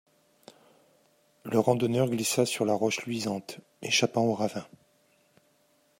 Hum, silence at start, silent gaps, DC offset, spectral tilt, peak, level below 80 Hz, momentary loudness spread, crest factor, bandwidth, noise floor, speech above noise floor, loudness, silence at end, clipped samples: none; 1.45 s; none; under 0.1%; -4 dB/octave; -8 dBFS; -74 dBFS; 14 LU; 22 dB; 16 kHz; -67 dBFS; 40 dB; -27 LUFS; 1.35 s; under 0.1%